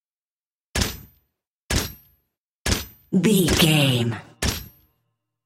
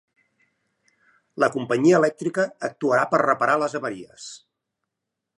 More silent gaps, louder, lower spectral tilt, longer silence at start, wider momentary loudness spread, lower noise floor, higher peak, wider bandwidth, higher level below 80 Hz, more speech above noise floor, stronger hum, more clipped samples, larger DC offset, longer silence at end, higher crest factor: first, 1.50-1.69 s, 2.38-2.65 s vs none; about the same, -22 LUFS vs -22 LUFS; second, -4 dB/octave vs -5.5 dB/octave; second, 0.75 s vs 1.35 s; second, 13 LU vs 20 LU; first, under -90 dBFS vs -83 dBFS; about the same, -4 dBFS vs -4 dBFS; first, 16.5 kHz vs 11.5 kHz; first, -36 dBFS vs -72 dBFS; first, over 72 dB vs 62 dB; neither; neither; neither; second, 0.8 s vs 1.05 s; about the same, 20 dB vs 20 dB